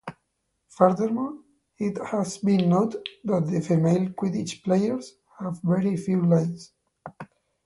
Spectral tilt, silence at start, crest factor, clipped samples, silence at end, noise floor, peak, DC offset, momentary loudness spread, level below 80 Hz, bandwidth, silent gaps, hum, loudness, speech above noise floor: -7.5 dB/octave; 0.05 s; 22 dB; under 0.1%; 0.4 s; -76 dBFS; -2 dBFS; under 0.1%; 21 LU; -66 dBFS; 11.5 kHz; none; none; -25 LUFS; 52 dB